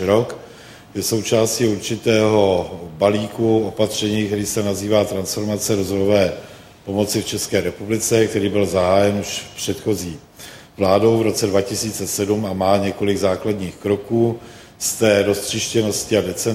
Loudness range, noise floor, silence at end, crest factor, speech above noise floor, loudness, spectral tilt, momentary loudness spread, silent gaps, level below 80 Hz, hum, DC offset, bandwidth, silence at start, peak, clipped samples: 2 LU; -41 dBFS; 0 s; 18 dB; 23 dB; -19 LUFS; -4.5 dB/octave; 9 LU; none; -50 dBFS; none; under 0.1%; 16.5 kHz; 0 s; -2 dBFS; under 0.1%